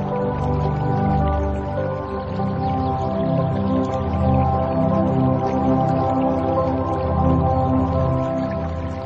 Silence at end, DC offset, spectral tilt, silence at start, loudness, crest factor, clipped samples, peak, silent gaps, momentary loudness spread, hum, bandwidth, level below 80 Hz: 0 s; under 0.1%; -10 dB/octave; 0 s; -21 LUFS; 14 dB; under 0.1%; -6 dBFS; none; 6 LU; none; 7.4 kHz; -32 dBFS